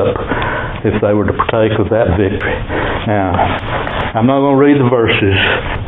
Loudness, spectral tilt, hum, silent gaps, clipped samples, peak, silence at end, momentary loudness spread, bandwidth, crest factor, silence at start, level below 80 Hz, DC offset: -13 LUFS; -10 dB/octave; none; none; under 0.1%; 0 dBFS; 0 s; 8 LU; 4.1 kHz; 12 dB; 0 s; -28 dBFS; under 0.1%